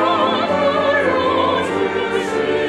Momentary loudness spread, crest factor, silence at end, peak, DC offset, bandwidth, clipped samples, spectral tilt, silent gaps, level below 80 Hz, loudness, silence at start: 3 LU; 14 dB; 0 s; -4 dBFS; under 0.1%; 12 kHz; under 0.1%; -5 dB/octave; none; -54 dBFS; -17 LUFS; 0 s